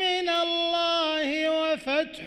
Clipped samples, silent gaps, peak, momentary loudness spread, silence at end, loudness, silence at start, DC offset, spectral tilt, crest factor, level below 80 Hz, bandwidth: under 0.1%; none; -14 dBFS; 3 LU; 0 s; -25 LUFS; 0 s; under 0.1%; -2.5 dB/octave; 12 dB; -62 dBFS; 12 kHz